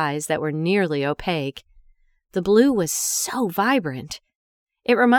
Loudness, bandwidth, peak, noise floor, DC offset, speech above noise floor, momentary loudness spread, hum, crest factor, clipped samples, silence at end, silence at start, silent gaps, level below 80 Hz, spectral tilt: -22 LUFS; over 20 kHz; -4 dBFS; -57 dBFS; under 0.1%; 37 dB; 13 LU; none; 18 dB; under 0.1%; 0 s; 0 s; 4.35-4.66 s; -52 dBFS; -4 dB/octave